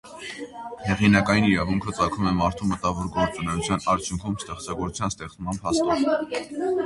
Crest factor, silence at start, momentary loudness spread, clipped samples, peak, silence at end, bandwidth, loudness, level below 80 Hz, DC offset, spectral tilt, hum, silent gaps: 22 dB; 0.05 s; 13 LU; under 0.1%; -2 dBFS; 0 s; 11.5 kHz; -24 LUFS; -44 dBFS; under 0.1%; -5.5 dB/octave; none; none